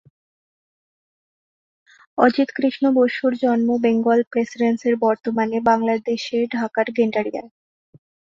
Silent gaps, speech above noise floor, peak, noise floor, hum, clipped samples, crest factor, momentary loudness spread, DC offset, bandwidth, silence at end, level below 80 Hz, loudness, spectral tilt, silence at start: 4.27-4.31 s; over 71 dB; -2 dBFS; under -90 dBFS; none; under 0.1%; 18 dB; 6 LU; under 0.1%; 7.4 kHz; 0.85 s; -64 dBFS; -20 LUFS; -6 dB/octave; 2.15 s